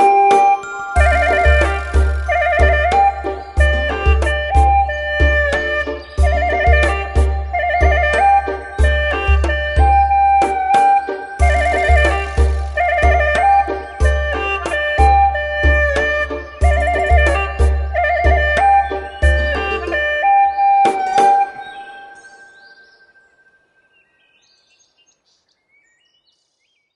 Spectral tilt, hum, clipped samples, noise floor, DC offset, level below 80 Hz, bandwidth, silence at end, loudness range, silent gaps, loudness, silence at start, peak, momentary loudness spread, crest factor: -5.5 dB/octave; none; under 0.1%; -66 dBFS; under 0.1%; -20 dBFS; 11.5 kHz; 4.8 s; 2 LU; none; -15 LUFS; 0 s; 0 dBFS; 6 LU; 14 dB